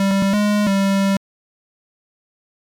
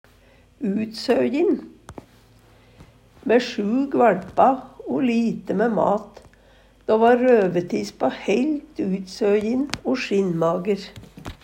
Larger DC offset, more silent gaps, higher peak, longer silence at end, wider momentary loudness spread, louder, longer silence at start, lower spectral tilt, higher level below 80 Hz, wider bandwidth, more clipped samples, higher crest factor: neither; neither; second, -16 dBFS vs -2 dBFS; first, 1.5 s vs 0.1 s; second, 4 LU vs 10 LU; first, -18 LUFS vs -21 LUFS; second, 0 s vs 0.6 s; about the same, -6 dB/octave vs -6.5 dB/octave; about the same, -58 dBFS vs -54 dBFS; about the same, 17.5 kHz vs 16 kHz; neither; second, 4 dB vs 20 dB